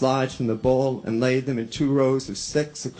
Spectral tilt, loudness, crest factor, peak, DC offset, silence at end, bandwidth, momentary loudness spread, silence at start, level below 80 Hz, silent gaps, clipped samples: -6 dB/octave; -23 LUFS; 16 dB; -8 dBFS; under 0.1%; 0 s; 9.4 kHz; 5 LU; 0 s; -50 dBFS; none; under 0.1%